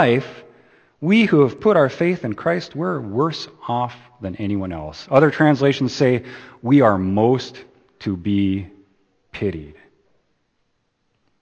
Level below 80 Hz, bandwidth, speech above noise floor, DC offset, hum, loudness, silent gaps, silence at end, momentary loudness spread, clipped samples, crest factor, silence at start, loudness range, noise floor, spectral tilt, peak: -54 dBFS; 8.6 kHz; 50 dB; under 0.1%; none; -19 LUFS; none; 1.7 s; 16 LU; under 0.1%; 20 dB; 0 s; 9 LU; -69 dBFS; -7.5 dB/octave; 0 dBFS